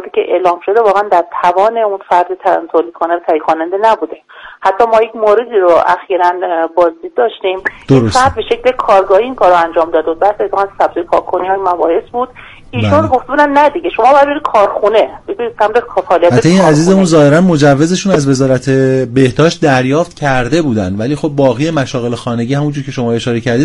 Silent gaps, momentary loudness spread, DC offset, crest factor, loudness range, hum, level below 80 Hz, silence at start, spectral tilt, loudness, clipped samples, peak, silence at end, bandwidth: none; 8 LU; under 0.1%; 10 dB; 4 LU; none; -40 dBFS; 0 s; -6 dB/octave; -11 LUFS; 0.2%; 0 dBFS; 0 s; 11.5 kHz